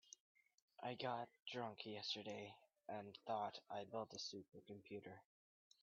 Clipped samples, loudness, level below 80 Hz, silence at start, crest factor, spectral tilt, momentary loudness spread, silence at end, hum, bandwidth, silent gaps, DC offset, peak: under 0.1%; -51 LUFS; under -90 dBFS; 0.05 s; 20 dB; -2.5 dB/octave; 14 LU; 0.6 s; none; 7.2 kHz; 0.20-0.35 s, 0.62-0.68 s, 1.42-1.46 s; under 0.1%; -32 dBFS